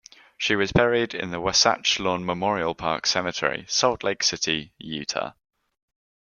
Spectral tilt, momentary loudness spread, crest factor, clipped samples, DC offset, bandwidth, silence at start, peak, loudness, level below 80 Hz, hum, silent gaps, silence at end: -2.5 dB/octave; 9 LU; 22 dB; under 0.1%; under 0.1%; 11 kHz; 0.4 s; -4 dBFS; -23 LUFS; -50 dBFS; none; none; 1 s